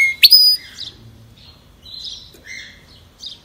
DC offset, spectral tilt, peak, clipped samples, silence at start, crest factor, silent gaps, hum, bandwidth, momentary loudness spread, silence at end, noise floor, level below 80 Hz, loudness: under 0.1%; 1.5 dB/octave; 0 dBFS; 0.3%; 0 s; 18 dB; none; none; 16 kHz; 28 LU; 0.15 s; -45 dBFS; -52 dBFS; -8 LUFS